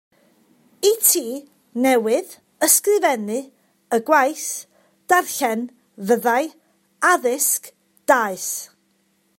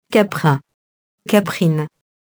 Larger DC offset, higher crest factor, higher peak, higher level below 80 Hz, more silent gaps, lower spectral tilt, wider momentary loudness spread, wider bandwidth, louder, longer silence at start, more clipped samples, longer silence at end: neither; about the same, 20 dB vs 18 dB; about the same, 0 dBFS vs 0 dBFS; second, -74 dBFS vs -62 dBFS; second, none vs 0.74-1.18 s; second, -2 dB/octave vs -6.5 dB/octave; first, 15 LU vs 11 LU; second, 16.5 kHz vs over 20 kHz; about the same, -19 LUFS vs -18 LUFS; first, 0.8 s vs 0.1 s; neither; first, 0.75 s vs 0.5 s